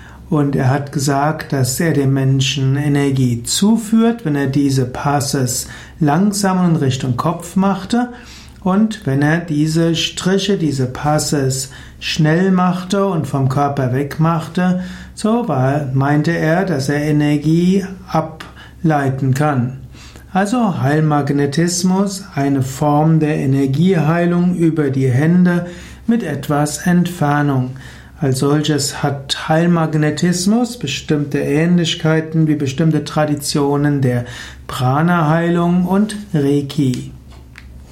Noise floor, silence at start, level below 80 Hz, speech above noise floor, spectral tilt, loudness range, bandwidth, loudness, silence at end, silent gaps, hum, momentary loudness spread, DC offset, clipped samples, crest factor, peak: -37 dBFS; 0 s; -42 dBFS; 22 dB; -6 dB/octave; 2 LU; 16 kHz; -16 LUFS; 0.05 s; none; none; 6 LU; under 0.1%; under 0.1%; 12 dB; -2 dBFS